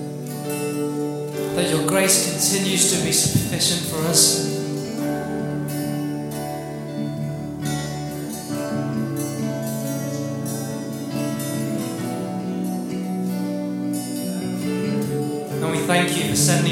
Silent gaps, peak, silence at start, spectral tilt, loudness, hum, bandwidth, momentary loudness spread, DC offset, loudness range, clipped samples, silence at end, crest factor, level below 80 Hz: none; 0 dBFS; 0 s; -3.5 dB/octave; -22 LUFS; none; 17 kHz; 11 LU; under 0.1%; 9 LU; under 0.1%; 0 s; 22 dB; -54 dBFS